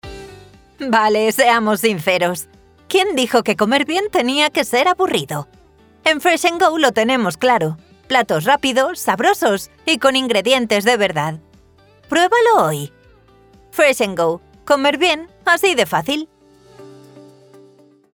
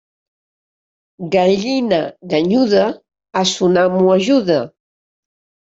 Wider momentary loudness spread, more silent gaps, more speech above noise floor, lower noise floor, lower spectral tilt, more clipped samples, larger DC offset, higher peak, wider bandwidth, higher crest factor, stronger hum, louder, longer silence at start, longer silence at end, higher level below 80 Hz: about the same, 11 LU vs 9 LU; neither; second, 34 dB vs over 76 dB; second, -50 dBFS vs under -90 dBFS; second, -3.5 dB/octave vs -5.5 dB/octave; neither; neither; about the same, 0 dBFS vs -2 dBFS; first, over 20 kHz vs 7.8 kHz; about the same, 16 dB vs 14 dB; neither; about the same, -16 LUFS vs -15 LUFS; second, 0.05 s vs 1.2 s; about the same, 0.95 s vs 0.95 s; about the same, -54 dBFS vs -58 dBFS